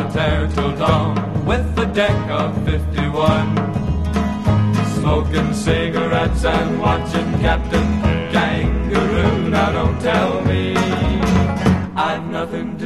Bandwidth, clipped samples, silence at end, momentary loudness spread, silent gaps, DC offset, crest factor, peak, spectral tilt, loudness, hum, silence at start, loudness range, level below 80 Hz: 12.5 kHz; under 0.1%; 0 s; 4 LU; none; 0.6%; 16 dB; 0 dBFS; -6.5 dB/octave; -18 LUFS; none; 0 s; 1 LU; -26 dBFS